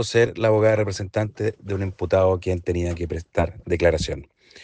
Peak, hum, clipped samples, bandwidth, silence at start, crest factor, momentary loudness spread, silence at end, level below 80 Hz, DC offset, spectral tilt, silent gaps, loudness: -6 dBFS; none; under 0.1%; 9.6 kHz; 0 s; 16 dB; 9 LU; 0.4 s; -40 dBFS; under 0.1%; -6 dB/octave; none; -23 LUFS